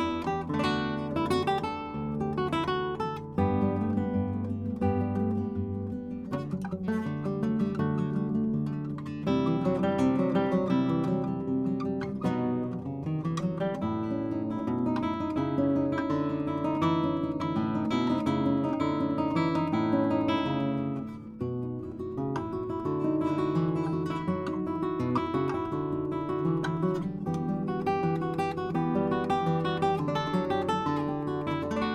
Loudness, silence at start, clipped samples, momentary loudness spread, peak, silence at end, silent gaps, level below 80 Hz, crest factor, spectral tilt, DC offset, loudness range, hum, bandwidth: -30 LUFS; 0 s; under 0.1%; 6 LU; -14 dBFS; 0 s; none; -58 dBFS; 14 dB; -8 dB/octave; under 0.1%; 3 LU; none; 11.5 kHz